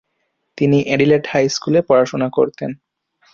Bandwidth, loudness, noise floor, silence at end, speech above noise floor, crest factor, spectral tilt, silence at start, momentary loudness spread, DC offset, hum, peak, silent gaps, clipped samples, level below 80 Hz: 7.6 kHz; -16 LUFS; -70 dBFS; 0.6 s; 55 dB; 16 dB; -6 dB/octave; 0.55 s; 11 LU; under 0.1%; none; -2 dBFS; none; under 0.1%; -56 dBFS